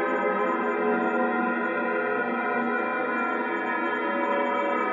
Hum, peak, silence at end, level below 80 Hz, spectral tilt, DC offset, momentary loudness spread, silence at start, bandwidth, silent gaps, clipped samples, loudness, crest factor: none; -12 dBFS; 0 s; -84 dBFS; -7 dB/octave; under 0.1%; 2 LU; 0 s; 7.4 kHz; none; under 0.1%; -26 LUFS; 12 dB